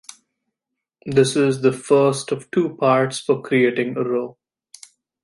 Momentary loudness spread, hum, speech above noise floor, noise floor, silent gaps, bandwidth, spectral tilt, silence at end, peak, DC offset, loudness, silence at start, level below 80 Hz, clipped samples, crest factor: 8 LU; none; 64 dB; -83 dBFS; none; 11.5 kHz; -5.5 dB/octave; 0.95 s; -2 dBFS; under 0.1%; -19 LUFS; 1.05 s; -64 dBFS; under 0.1%; 18 dB